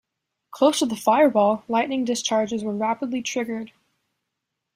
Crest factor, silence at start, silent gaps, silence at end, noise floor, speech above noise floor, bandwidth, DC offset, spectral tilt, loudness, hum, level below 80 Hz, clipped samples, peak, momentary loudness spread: 18 dB; 0.55 s; none; 1.1 s; -81 dBFS; 60 dB; 16 kHz; under 0.1%; -4 dB/octave; -22 LUFS; none; -68 dBFS; under 0.1%; -4 dBFS; 10 LU